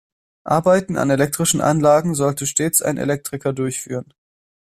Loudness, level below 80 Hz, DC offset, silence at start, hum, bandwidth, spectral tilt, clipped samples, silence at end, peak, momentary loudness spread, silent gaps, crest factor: -18 LUFS; -54 dBFS; under 0.1%; 0.45 s; none; 15.5 kHz; -4.5 dB/octave; under 0.1%; 0.75 s; -2 dBFS; 9 LU; none; 16 dB